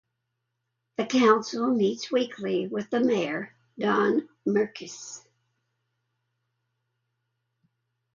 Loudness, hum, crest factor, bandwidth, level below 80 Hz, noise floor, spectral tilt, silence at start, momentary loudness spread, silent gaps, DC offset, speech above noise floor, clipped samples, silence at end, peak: -26 LUFS; none; 22 dB; 7.4 kHz; -74 dBFS; -81 dBFS; -5 dB/octave; 1 s; 17 LU; none; under 0.1%; 55 dB; under 0.1%; 3 s; -6 dBFS